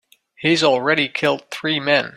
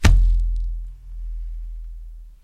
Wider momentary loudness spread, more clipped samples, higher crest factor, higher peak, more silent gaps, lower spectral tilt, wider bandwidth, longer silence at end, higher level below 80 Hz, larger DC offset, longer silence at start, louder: second, 7 LU vs 20 LU; neither; about the same, 16 dB vs 20 dB; about the same, -2 dBFS vs 0 dBFS; neither; about the same, -4 dB/octave vs -5 dB/octave; first, 15 kHz vs 12 kHz; about the same, 0.1 s vs 0.1 s; second, -62 dBFS vs -20 dBFS; neither; first, 0.4 s vs 0 s; first, -18 LUFS vs -25 LUFS